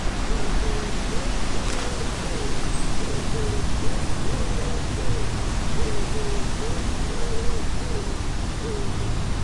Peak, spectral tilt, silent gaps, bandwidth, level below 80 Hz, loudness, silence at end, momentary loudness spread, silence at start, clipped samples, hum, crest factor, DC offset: -8 dBFS; -4.5 dB/octave; none; 11.5 kHz; -26 dBFS; -28 LUFS; 0 s; 2 LU; 0 s; under 0.1%; none; 14 dB; under 0.1%